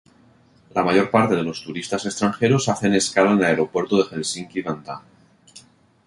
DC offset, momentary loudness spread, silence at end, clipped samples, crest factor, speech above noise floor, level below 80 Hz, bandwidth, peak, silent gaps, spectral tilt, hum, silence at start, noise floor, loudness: under 0.1%; 11 LU; 0.45 s; under 0.1%; 20 dB; 34 dB; -56 dBFS; 11.5 kHz; -2 dBFS; none; -5 dB/octave; none; 0.75 s; -54 dBFS; -21 LUFS